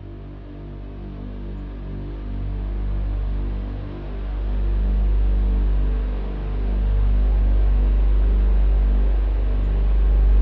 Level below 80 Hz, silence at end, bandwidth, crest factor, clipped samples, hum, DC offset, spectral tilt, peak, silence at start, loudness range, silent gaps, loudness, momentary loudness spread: -20 dBFS; 0 s; 3.9 kHz; 10 dB; under 0.1%; 50 Hz at -30 dBFS; under 0.1%; -10.5 dB/octave; -10 dBFS; 0 s; 9 LU; none; -24 LUFS; 14 LU